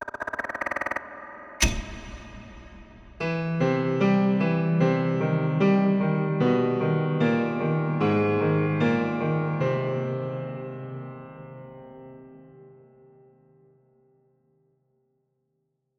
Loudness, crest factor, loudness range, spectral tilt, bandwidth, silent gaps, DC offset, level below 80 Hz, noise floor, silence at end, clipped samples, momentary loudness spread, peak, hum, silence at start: -25 LUFS; 22 dB; 12 LU; -6.5 dB/octave; 14.5 kHz; none; under 0.1%; -46 dBFS; -76 dBFS; 3.3 s; under 0.1%; 20 LU; -4 dBFS; none; 0 s